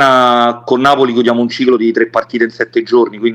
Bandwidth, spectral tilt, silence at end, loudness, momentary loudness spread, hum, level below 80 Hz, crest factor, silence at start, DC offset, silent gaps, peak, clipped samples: 10.5 kHz; -5.5 dB/octave; 0 s; -12 LUFS; 6 LU; none; -56 dBFS; 10 dB; 0 s; under 0.1%; none; 0 dBFS; under 0.1%